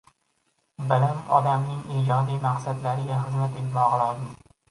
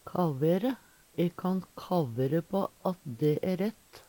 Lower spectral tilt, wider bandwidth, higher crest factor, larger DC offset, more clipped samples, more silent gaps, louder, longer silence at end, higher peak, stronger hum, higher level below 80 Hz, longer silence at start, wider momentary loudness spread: about the same, -7.5 dB/octave vs -8 dB/octave; second, 11.5 kHz vs 18.5 kHz; about the same, 20 dB vs 16 dB; neither; neither; neither; first, -25 LUFS vs -31 LUFS; first, 0.35 s vs 0.1 s; first, -6 dBFS vs -16 dBFS; neither; first, -62 dBFS vs -68 dBFS; first, 0.8 s vs 0.05 s; about the same, 6 LU vs 7 LU